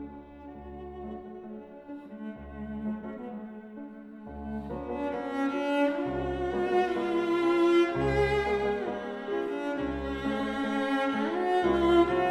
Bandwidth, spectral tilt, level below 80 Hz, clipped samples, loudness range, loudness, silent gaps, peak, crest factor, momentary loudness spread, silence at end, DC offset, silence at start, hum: 10.5 kHz; -6.5 dB/octave; -48 dBFS; under 0.1%; 13 LU; -29 LUFS; none; -12 dBFS; 16 dB; 20 LU; 0 s; under 0.1%; 0 s; none